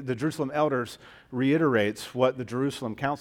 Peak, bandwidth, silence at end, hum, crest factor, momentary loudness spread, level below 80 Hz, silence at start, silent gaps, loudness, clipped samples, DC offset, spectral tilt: -8 dBFS; 16.5 kHz; 0 s; none; 18 dB; 9 LU; -64 dBFS; 0 s; none; -27 LUFS; under 0.1%; under 0.1%; -6.5 dB/octave